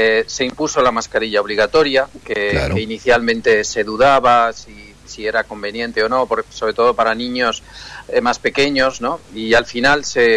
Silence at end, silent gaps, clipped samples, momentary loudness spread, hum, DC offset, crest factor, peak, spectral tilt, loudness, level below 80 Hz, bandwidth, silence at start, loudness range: 0 s; none; under 0.1%; 10 LU; none; under 0.1%; 12 dB; -4 dBFS; -3.5 dB/octave; -16 LUFS; -40 dBFS; 11 kHz; 0 s; 3 LU